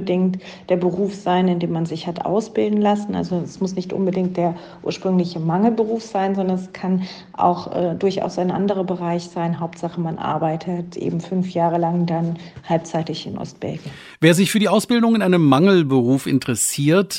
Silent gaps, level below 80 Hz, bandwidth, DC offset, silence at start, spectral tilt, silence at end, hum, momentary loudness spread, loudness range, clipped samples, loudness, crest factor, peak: none; -58 dBFS; 16 kHz; under 0.1%; 0 s; -6 dB/octave; 0 s; none; 10 LU; 6 LU; under 0.1%; -20 LUFS; 18 dB; 0 dBFS